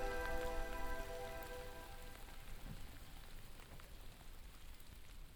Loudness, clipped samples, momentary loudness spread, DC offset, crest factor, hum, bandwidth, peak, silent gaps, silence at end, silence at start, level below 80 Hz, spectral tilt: -51 LUFS; under 0.1%; 15 LU; under 0.1%; 18 dB; none; over 20 kHz; -30 dBFS; none; 0 s; 0 s; -50 dBFS; -4 dB/octave